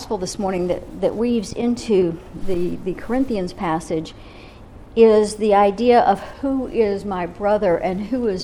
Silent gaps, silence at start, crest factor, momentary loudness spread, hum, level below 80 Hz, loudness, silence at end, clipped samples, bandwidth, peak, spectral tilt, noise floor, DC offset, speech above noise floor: none; 0 s; 16 dB; 11 LU; none; -40 dBFS; -20 LUFS; 0 s; under 0.1%; 12.5 kHz; -2 dBFS; -6 dB/octave; -40 dBFS; under 0.1%; 21 dB